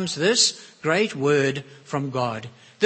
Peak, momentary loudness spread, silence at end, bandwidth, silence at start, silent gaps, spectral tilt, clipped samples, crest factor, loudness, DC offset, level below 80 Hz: -4 dBFS; 15 LU; 0 s; 8.8 kHz; 0 s; none; -3 dB/octave; under 0.1%; 20 dB; -22 LUFS; under 0.1%; -66 dBFS